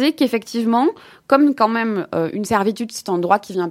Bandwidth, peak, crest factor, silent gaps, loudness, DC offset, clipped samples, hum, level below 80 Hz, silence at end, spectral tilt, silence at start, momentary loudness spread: 16 kHz; 0 dBFS; 18 dB; none; -19 LUFS; under 0.1%; under 0.1%; none; -60 dBFS; 0 s; -5 dB/octave; 0 s; 7 LU